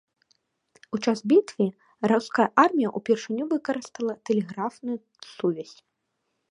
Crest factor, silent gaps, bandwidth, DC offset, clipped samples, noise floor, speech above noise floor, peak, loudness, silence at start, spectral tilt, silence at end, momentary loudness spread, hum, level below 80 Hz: 22 dB; none; 10.5 kHz; under 0.1%; under 0.1%; -78 dBFS; 53 dB; -4 dBFS; -25 LUFS; 0.9 s; -6 dB/octave; 0.8 s; 13 LU; none; -74 dBFS